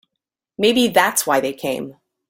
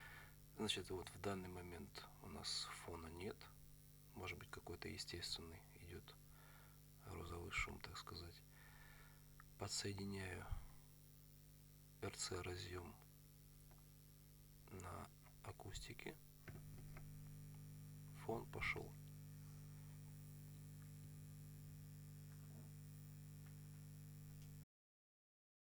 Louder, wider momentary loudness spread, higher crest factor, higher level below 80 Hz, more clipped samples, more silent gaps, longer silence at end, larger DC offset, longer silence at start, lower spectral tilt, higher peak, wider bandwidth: first, -18 LUFS vs -53 LUFS; second, 12 LU vs 19 LU; second, 18 dB vs 26 dB; first, -60 dBFS vs -66 dBFS; neither; neither; second, 0.35 s vs 1 s; neither; first, 0.6 s vs 0 s; about the same, -2.5 dB/octave vs -3.5 dB/octave; first, -2 dBFS vs -28 dBFS; second, 17 kHz vs over 20 kHz